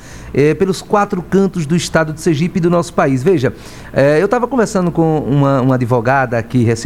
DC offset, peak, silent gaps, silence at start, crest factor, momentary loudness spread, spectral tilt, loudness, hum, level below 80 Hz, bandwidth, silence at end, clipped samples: 0.8%; 0 dBFS; none; 0 s; 14 dB; 3 LU; -6.5 dB/octave; -14 LUFS; none; -40 dBFS; 15 kHz; 0 s; under 0.1%